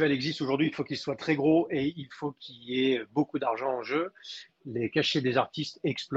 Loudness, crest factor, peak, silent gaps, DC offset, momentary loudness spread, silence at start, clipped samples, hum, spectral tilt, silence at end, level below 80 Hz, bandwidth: -29 LUFS; 18 dB; -12 dBFS; none; under 0.1%; 12 LU; 0 s; under 0.1%; none; -6 dB/octave; 0 s; -68 dBFS; 8 kHz